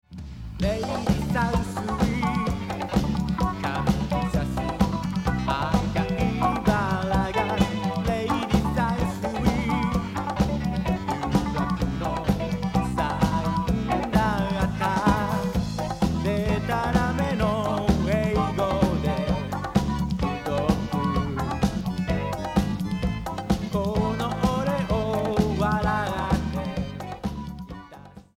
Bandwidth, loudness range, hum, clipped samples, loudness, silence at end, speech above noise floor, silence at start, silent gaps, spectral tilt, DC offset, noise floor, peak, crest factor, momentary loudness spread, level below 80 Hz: 16 kHz; 2 LU; none; under 0.1%; -25 LUFS; 0.15 s; 21 dB; 0.1 s; none; -6.5 dB/octave; under 0.1%; -46 dBFS; -6 dBFS; 18 dB; 5 LU; -34 dBFS